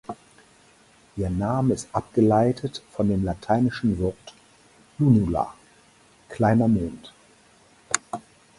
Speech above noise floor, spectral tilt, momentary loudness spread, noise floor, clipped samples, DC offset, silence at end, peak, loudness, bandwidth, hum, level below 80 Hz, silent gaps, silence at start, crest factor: 34 dB; -6.5 dB/octave; 18 LU; -56 dBFS; under 0.1%; under 0.1%; 0.4 s; -2 dBFS; -24 LUFS; 11.5 kHz; none; -46 dBFS; none; 0.1 s; 22 dB